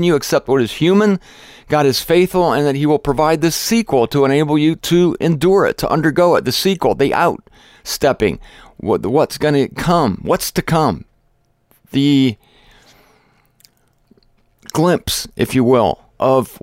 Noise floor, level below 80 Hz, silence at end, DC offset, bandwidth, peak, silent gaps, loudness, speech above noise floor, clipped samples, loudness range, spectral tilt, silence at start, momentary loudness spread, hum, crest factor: -60 dBFS; -42 dBFS; 0.05 s; under 0.1%; 16.5 kHz; -2 dBFS; none; -15 LUFS; 45 dB; under 0.1%; 7 LU; -5.5 dB/octave; 0 s; 6 LU; none; 12 dB